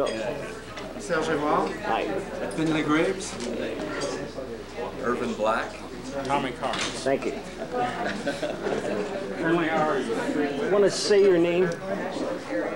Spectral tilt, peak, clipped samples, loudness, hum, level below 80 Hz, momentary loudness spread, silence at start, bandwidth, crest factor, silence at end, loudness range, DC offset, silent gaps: -4.5 dB/octave; -10 dBFS; under 0.1%; -27 LUFS; none; -52 dBFS; 13 LU; 0 s; 16.5 kHz; 16 dB; 0 s; 5 LU; 0.3%; none